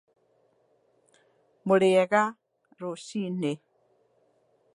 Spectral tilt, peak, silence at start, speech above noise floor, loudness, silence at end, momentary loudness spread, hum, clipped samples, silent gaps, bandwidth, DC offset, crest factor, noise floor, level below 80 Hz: -6 dB/octave; -8 dBFS; 1.65 s; 43 dB; -26 LUFS; 1.2 s; 17 LU; none; under 0.1%; none; 11.5 kHz; under 0.1%; 22 dB; -68 dBFS; -78 dBFS